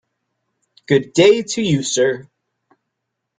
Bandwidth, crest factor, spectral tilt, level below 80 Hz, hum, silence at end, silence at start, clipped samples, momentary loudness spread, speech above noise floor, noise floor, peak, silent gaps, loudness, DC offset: 9.4 kHz; 18 dB; -4.5 dB/octave; -58 dBFS; none; 1.15 s; 0.9 s; under 0.1%; 6 LU; 62 dB; -77 dBFS; -2 dBFS; none; -16 LUFS; under 0.1%